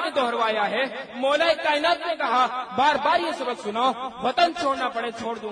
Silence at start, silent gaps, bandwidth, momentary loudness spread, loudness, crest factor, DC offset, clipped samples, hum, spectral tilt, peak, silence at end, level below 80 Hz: 0 s; none; 10.5 kHz; 7 LU; -23 LUFS; 18 dB; under 0.1%; under 0.1%; none; -3 dB/octave; -6 dBFS; 0 s; -64 dBFS